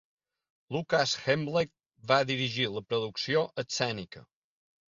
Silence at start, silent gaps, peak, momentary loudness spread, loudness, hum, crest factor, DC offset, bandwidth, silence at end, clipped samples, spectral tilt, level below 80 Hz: 0.7 s; none; -10 dBFS; 10 LU; -30 LUFS; none; 22 dB; under 0.1%; 7.6 kHz; 0.7 s; under 0.1%; -4 dB/octave; -68 dBFS